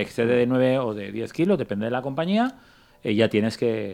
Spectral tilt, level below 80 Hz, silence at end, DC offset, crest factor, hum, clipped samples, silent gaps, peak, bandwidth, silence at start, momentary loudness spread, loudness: -7 dB/octave; -60 dBFS; 0 s; under 0.1%; 18 dB; none; under 0.1%; none; -6 dBFS; 14 kHz; 0 s; 8 LU; -24 LUFS